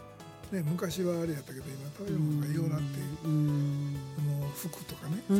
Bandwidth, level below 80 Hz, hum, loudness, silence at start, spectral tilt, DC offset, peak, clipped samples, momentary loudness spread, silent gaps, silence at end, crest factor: 16.5 kHz; -60 dBFS; none; -34 LUFS; 0 s; -7 dB/octave; under 0.1%; -18 dBFS; under 0.1%; 11 LU; none; 0 s; 16 dB